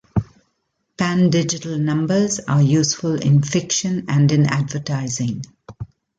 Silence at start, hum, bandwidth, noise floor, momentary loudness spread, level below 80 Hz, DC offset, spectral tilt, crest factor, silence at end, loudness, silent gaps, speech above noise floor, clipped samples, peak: 0.15 s; none; 9.2 kHz; -71 dBFS; 10 LU; -48 dBFS; under 0.1%; -5.5 dB/octave; 14 dB; 0.35 s; -19 LUFS; none; 54 dB; under 0.1%; -4 dBFS